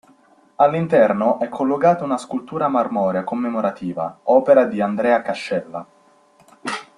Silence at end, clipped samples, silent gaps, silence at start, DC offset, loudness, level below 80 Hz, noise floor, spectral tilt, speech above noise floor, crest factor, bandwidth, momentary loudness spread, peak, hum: 0.15 s; under 0.1%; none; 0.6 s; under 0.1%; -19 LUFS; -64 dBFS; -54 dBFS; -7 dB/octave; 36 dB; 18 dB; 11.5 kHz; 11 LU; -2 dBFS; none